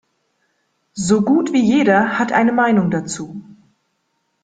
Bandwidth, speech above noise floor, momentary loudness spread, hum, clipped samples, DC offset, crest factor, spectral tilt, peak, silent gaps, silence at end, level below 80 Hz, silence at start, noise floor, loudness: 9.2 kHz; 53 dB; 15 LU; none; under 0.1%; under 0.1%; 16 dB; -5.5 dB/octave; -2 dBFS; none; 1 s; -56 dBFS; 0.95 s; -69 dBFS; -16 LUFS